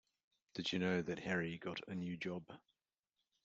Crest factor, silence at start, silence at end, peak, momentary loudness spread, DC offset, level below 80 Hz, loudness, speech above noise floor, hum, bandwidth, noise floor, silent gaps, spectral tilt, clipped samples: 18 dB; 0.55 s; 0.85 s; -24 dBFS; 13 LU; under 0.1%; -76 dBFS; -42 LUFS; over 48 dB; none; 8 kHz; under -90 dBFS; none; -5.5 dB/octave; under 0.1%